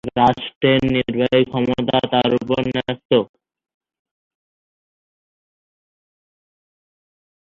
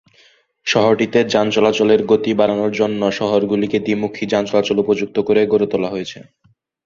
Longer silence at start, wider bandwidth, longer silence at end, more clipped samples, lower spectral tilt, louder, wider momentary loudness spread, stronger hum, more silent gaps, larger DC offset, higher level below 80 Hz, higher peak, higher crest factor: second, 0.05 s vs 0.65 s; about the same, 6.8 kHz vs 7.4 kHz; first, 4.35 s vs 0.65 s; neither; first, -7.5 dB/octave vs -5.5 dB/octave; about the same, -18 LUFS vs -17 LUFS; about the same, 4 LU vs 6 LU; neither; first, 0.56-0.61 s, 3.05-3.09 s vs none; neither; about the same, -50 dBFS vs -54 dBFS; about the same, -2 dBFS vs 0 dBFS; about the same, 20 dB vs 16 dB